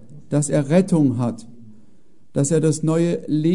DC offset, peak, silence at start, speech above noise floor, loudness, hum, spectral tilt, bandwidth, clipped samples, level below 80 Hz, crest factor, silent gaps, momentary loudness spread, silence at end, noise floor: 1%; -4 dBFS; 0.1 s; 38 dB; -20 LUFS; none; -7 dB/octave; 11 kHz; under 0.1%; -60 dBFS; 16 dB; none; 8 LU; 0 s; -57 dBFS